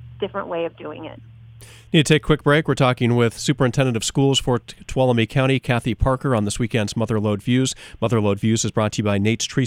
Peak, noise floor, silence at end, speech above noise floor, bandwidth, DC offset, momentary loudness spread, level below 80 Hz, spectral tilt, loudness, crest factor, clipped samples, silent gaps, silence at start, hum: 0 dBFS; -43 dBFS; 0 s; 24 dB; 15 kHz; under 0.1%; 9 LU; -38 dBFS; -5.5 dB/octave; -20 LUFS; 20 dB; under 0.1%; none; 0 s; none